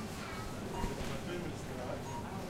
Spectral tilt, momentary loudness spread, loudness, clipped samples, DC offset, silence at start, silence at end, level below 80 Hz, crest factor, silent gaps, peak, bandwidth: -5 dB/octave; 3 LU; -41 LUFS; under 0.1%; under 0.1%; 0 s; 0 s; -48 dBFS; 20 dB; none; -20 dBFS; 16 kHz